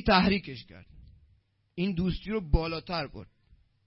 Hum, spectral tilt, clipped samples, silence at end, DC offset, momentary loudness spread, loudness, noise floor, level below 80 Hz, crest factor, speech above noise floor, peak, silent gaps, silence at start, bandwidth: none; -10 dB/octave; under 0.1%; 0.6 s; under 0.1%; 21 LU; -30 LUFS; -67 dBFS; -38 dBFS; 20 dB; 39 dB; -10 dBFS; none; 0 s; 5.8 kHz